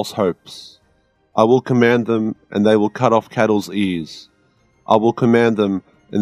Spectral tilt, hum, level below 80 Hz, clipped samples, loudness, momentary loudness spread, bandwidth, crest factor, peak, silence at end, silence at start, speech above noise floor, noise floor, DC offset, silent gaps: -6.5 dB/octave; none; -60 dBFS; under 0.1%; -17 LUFS; 12 LU; 14 kHz; 18 dB; 0 dBFS; 0 s; 0 s; 44 dB; -60 dBFS; under 0.1%; none